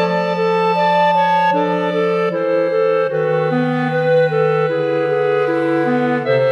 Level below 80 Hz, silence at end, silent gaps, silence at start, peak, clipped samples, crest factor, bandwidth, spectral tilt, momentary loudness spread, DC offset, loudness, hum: -72 dBFS; 0 s; none; 0 s; -4 dBFS; under 0.1%; 10 dB; 8.4 kHz; -7.5 dB/octave; 3 LU; under 0.1%; -16 LUFS; none